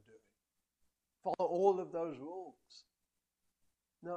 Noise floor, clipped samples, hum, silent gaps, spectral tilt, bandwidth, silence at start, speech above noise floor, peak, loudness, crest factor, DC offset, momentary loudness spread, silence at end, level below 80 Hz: -88 dBFS; under 0.1%; none; none; -7 dB/octave; 8.4 kHz; 0.15 s; 51 dB; -18 dBFS; -37 LUFS; 24 dB; under 0.1%; 19 LU; 0 s; -88 dBFS